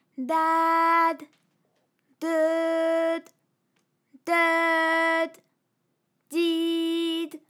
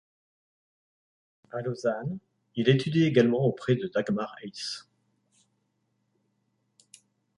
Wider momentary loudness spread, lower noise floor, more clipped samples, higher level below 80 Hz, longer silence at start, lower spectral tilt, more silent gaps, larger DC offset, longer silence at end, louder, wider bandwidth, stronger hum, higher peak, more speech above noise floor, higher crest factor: second, 11 LU vs 15 LU; about the same, -75 dBFS vs -75 dBFS; neither; second, under -90 dBFS vs -70 dBFS; second, 0.2 s vs 1.55 s; second, -2 dB/octave vs -6.5 dB/octave; neither; neither; second, 0.1 s vs 2.55 s; first, -24 LUFS vs -27 LUFS; first, 16 kHz vs 11.5 kHz; second, none vs 50 Hz at -55 dBFS; second, -12 dBFS vs -8 dBFS; about the same, 51 dB vs 49 dB; second, 14 dB vs 24 dB